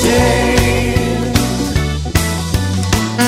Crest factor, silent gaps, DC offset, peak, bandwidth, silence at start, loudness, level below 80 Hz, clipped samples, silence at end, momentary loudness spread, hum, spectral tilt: 14 dB; none; under 0.1%; 0 dBFS; 16.5 kHz; 0 s; -15 LUFS; -22 dBFS; under 0.1%; 0 s; 5 LU; none; -5 dB/octave